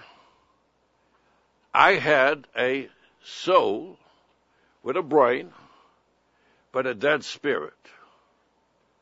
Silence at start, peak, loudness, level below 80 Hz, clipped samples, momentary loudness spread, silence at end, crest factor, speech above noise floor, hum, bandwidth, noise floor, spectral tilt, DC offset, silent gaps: 1.75 s; -2 dBFS; -23 LUFS; -72 dBFS; under 0.1%; 20 LU; 1.35 s; 24 dB; 44 dB; none; 8 kHz; -67 dBFS; -4.5 dB/octave; under 0.1%; none